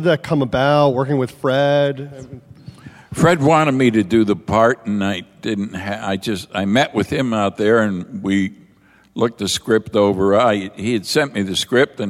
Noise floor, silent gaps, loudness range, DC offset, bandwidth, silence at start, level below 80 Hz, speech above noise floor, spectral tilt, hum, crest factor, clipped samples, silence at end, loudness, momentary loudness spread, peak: -52 dBFS; none; 2 LU; under 0.1%; 16 kHz; 0 s; -50 dBFS; 35 dB; -5.5 dB/octave; none; 16 dB; under 0.1%; 0 s; -17 LUFS; 10 LU; -2 dBFS